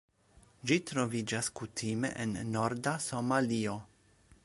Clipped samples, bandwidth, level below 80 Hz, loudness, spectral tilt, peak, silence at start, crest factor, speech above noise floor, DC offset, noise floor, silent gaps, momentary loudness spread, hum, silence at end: under 0.1%; 11.5 kHz; -64 dBFS; -34 LUFS; -4.5 dB/octave; -14 dBFS; 0.65 s; 20 dB; 30 dB; under 0.1%; -64 dBFS; none; 7 LU; none; 0.6 s